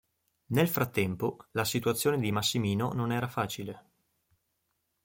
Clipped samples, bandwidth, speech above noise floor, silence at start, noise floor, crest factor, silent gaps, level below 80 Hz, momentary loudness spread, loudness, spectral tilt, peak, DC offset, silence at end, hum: under 0.1%; 17 kHz; 49 dB; 0.5 s; -79 dBFS; 18 dB; none; -64 dBFS; 7 LU; -30 LUFS; -5 dB/octave; -12 dBFS; under 0.1%; 1.25 s; none